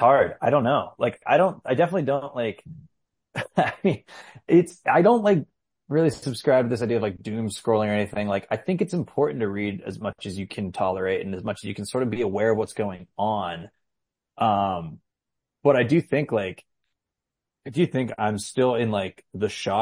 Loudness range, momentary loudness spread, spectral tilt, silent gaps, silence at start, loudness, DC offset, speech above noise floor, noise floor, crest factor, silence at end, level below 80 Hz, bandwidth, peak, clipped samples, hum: 5 LU; 12 LU; -6.5 dB/octave; none; 0 s; -24 LUFS; under 0.1%; 63 dB; -86 dBFS; 18 dB; 0 s; -64 dBFS; 15 kHz; -6 dBFS; under 0.1%; none